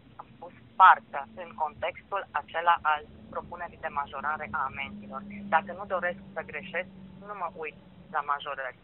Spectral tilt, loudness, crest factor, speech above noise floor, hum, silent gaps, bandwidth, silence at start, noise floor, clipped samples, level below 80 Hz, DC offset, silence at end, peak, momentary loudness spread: -1.5 dB/octave; -29 LUFS; 26 dB; 19 dB; none; none; 4 kHz; 0.2 s; -49 dBFS; under 0.1%; -62 dBFS; under 0.1%; 0.1 s; -4 dBFS; 16 LU